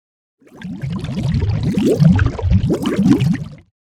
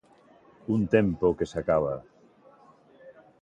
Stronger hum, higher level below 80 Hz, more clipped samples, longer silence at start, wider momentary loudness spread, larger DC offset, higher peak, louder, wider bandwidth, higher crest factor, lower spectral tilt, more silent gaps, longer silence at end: neither; first, -28 dBFS vs -52 dBFS; neither; second, 0.55 s vs 0.7 s; first, 15 LU vs 12 LU; neither; first, 0 dBFS vs -8 dBFS; first, -16 LUFS vs -26 LUFS; first, 14.5 kHz vs 9 kHz; second, 16 dB vs 22 dB; about the same, -8 dB/octave vs -8 dB/octave; neither; about the same, 0.35 s vs 0.3 s